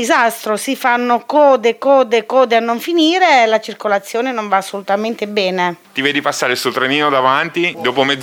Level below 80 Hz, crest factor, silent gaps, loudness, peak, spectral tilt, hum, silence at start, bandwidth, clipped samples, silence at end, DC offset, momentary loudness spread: -68 dBFS; 14 dB; none; -14 LUFS; 0 dBFS; -3.5 dB/octave; none; 0 s; over 20 kHz; under 0.1%; 0 s; under 0.1%; 7 LU